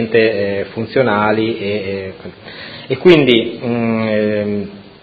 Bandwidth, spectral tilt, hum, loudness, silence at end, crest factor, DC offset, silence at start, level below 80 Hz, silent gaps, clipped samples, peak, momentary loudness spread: 7 kHz; -8 dB/octave; none; -15 LUFS; 0.15 s; 16 dB; under 0.1%; 0 s; -48 dBFS; none; under 0.1%; 0 dBFS; 20 LU